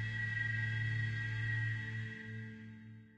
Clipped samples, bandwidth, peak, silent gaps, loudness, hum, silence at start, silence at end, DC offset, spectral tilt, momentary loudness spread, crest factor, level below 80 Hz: under 0.1%; 8 kHz; -26 dBFS; none; -38 LUFS; none; 0 s; 0.05 s; under 0.1%; -6 dB/octave; 14 LU; 12 dB; -62 dBFS